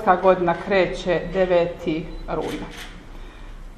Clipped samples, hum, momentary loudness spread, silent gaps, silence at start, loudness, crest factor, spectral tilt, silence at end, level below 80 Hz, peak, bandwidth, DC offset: under 0.1%; none; 24 LU; none; 0 s; -22 LUFS; 20 dB; -6.5 dB/octave; 0 s; -40 dBFS; -2 dBFS; 13.5 kHz; under 0.1%